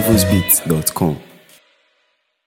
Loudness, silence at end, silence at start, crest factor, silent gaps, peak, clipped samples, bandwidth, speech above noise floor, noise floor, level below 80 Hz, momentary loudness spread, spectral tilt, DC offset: -15 LUFS; 1.25 s; 0 s; 18 dB; none; 0 dBFS; under 0.1%; 17 kHz; 49 dB; -65 dBFS; -40 dBFS; 8 LU; -4.5 dB/octave; under 0.1%